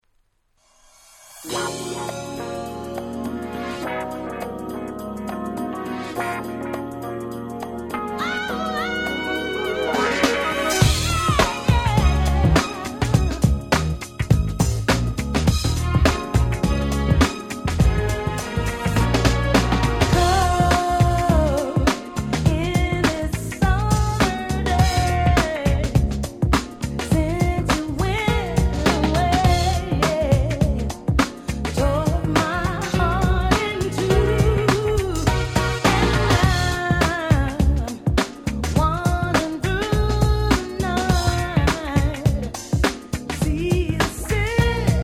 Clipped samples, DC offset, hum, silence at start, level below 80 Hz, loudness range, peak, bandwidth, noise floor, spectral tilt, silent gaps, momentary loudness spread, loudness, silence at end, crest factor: under 0.1%; under 0.1%; none; 1.3 s; -26 dBFS; 9 LU; -2 dBFS; 16 kHz; -64 dBFS; -5.5 dB/octave; none; 10 LU; -21 LUFS; 0 s; 18 dB